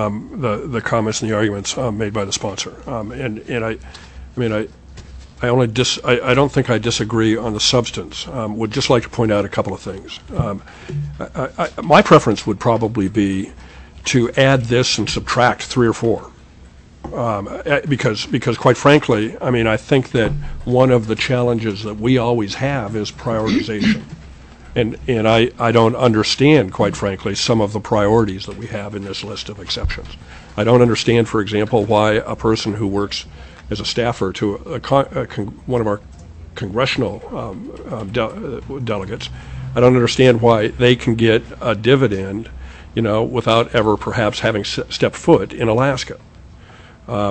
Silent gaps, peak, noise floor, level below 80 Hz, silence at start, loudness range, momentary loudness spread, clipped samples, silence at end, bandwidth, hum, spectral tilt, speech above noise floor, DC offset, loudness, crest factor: none; 0 dBFS; -42 dBFS; -38 dBFS; 0 s; 6 LU; 14 LU; under 0.1%; 0 s; 8.6 kHz; none; -5.5 dB/octave; 25 dB; under 0.1%; -17 LUFS; 18 dB